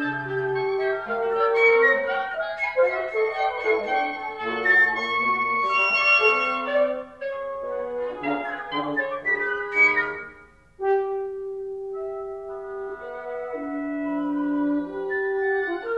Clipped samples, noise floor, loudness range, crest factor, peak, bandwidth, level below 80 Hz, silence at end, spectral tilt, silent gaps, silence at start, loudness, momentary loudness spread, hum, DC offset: under 0.1%; -50 dBFS; 10 LU; 18 dB; -8 dBFS; 8.2 kHz; -62 dBFS; 0 s; -5 dB/octave; none; 0 s; -23 LUFS; 15 LU; none; under 0.1%